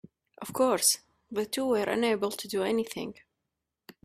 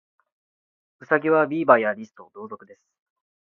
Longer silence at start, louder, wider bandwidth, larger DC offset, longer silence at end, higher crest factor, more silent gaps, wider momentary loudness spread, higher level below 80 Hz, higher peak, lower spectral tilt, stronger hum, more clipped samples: second, 0.4 s vs 1.1 s; second, -29 LUFS vs -20 LUFS; first, 16 kHz vs 6.6 kHz; neither; about the same, 0.9 s vs 0.85 s; about the same, 20 dB vs 24 dB; neither; second, 15 LU vs 23 LU; first, -70 dBFS vs -78 dBFS; second, -10 dBFS vs 0 dBFS; second, -2.5 dB/octave vs -8 dB/octave; neither; neither